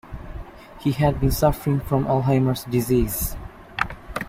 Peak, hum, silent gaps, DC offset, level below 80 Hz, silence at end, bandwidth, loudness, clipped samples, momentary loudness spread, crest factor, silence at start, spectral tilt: -2 dBFS; none; none; under 0.1%; -34 dBFS; 0 s; 16.5 kHz; -22 LUFS; under 0.1%; 18 LU; 20 dB; 0.05 s; -6.5 dB/octave